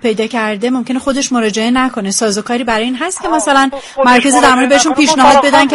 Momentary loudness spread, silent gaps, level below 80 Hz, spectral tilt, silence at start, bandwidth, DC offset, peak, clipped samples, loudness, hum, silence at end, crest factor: 8 LU; none; -42 dBFS; -2.5 dB/octave; 0.05 s; 12 kHz; under 0.1%; 0 dBFS; 0.1%; -11 LUFS; none; 0 s; 12 dB